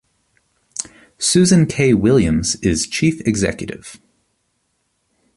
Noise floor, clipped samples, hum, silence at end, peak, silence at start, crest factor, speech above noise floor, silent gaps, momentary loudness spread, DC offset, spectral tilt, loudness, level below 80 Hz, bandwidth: -68 dBFS; under 0.1%; none; 1.4 s; -2 dBFS; 0.75 s; 16 dB; 52 dB; none; 17 LU; under 0.1%; -5 dB/octave; -16 LUFS; -40 dBFS; 11.5 kHz